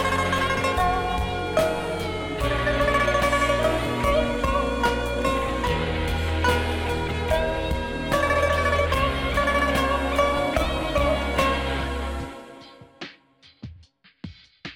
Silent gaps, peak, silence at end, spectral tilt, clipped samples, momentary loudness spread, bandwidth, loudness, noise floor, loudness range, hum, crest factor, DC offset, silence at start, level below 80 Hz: none; -8 dBFS; 0 s; -5 dB/octave; under 0.1%; 19 LU; 17.5 kHz; -23 LUFS; -55 dBFS; 4 LU; none; 16 dB; under 0.1%; 0 s; -32 dBFS